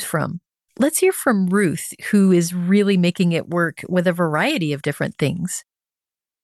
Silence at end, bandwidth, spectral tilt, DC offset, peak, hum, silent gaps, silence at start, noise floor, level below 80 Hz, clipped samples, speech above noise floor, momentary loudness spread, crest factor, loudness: 0.8 s; 12.5 kHz; -5.5 dB/octave; under 0.1%; -6 dBFS; none; none; 0 s; under -90 dBFS; -64 dBFS; under 0.1%; over 71 dB; 9 LU; 14 dB; -19 LUFS